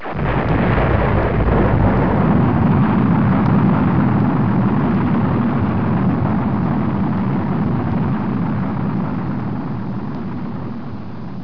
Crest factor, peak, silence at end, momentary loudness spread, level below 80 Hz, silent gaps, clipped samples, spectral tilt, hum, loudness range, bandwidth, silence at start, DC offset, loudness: 14 dB; -2 dBFS; 0 s; 10 LU; -30 dBFS; none; under 0.1%; -11 dB/octave; none; 6 LU; 5.4 kHz; 0 s; 3%; -17 LUFS